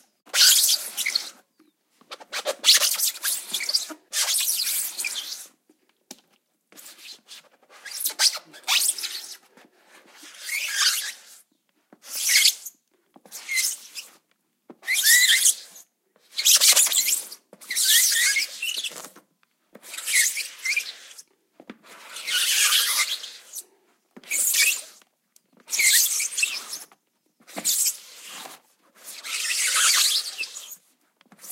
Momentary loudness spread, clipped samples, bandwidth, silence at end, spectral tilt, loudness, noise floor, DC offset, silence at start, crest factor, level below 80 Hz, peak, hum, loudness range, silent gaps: 22 LU; under 0.1%; 16 kHz; 0 s; 4.5 dB/octave; -20 LUFS; -71 dBFS; under 0.1%; 0.35 s; 24 dB; under -90 dBFS; -2 dBFS; none; 9 LU; none